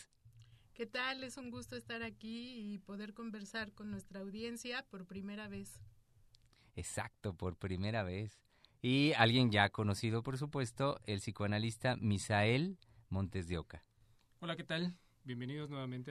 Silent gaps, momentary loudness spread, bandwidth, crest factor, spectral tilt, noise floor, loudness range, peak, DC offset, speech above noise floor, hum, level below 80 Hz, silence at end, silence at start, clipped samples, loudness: none; 16 LU; 13 kHz; 26 dB; -5.5 dB/octave; -69 dBFS; 12 LU; -12 dBFS; under 0.1%; 31 dB; none; -64 dBFS; 0 s; 0 s; under 0.1%; -39 LUFS